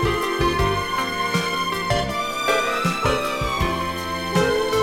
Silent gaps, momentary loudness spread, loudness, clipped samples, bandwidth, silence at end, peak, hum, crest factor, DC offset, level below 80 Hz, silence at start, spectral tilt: none; 3 LU; -22 LUFS; under 0.1%; 17.5 kHz; 0 s; -6 dBFS; none; 16 dB; under 0.1%; -36 dBFS; 0 s; -4.5 dB/octave